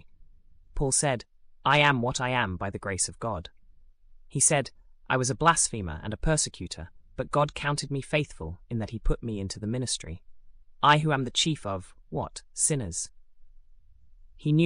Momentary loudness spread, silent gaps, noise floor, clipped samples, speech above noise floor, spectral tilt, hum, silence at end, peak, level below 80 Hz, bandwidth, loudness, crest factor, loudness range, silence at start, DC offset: 16 LU; none; -53 dBFS; under 0.1%; 26 dB; -3.5 dB/octave; none; 0 s; -8 dBFS; -42 dBFS; 12.5 kHz; -27 LUFS; 20 dB; 4 LU; 0.05 s; under 0.1%